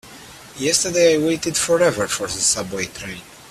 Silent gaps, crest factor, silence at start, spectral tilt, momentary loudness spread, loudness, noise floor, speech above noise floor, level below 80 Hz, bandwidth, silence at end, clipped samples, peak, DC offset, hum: none; 18 dB; 0.05 s; -2.5 dB/octave; 20 LU; -18 LUFS; -41 dBFS; 21 dB; -52 dBFS; 14.5 kHz; 0 s; under 0.1%; -2 dBFS; under 0.1%; none